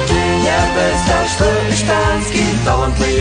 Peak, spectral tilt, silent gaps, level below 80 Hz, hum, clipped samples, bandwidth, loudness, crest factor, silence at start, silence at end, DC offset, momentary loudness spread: 0 dBFS; -4.5 dB/octave; none; -24 dBFS; none; under 0.1%; 10 kHz; -14 LUFS; 14 dB; 0 s; 0 s; under 0.1%; 2 LU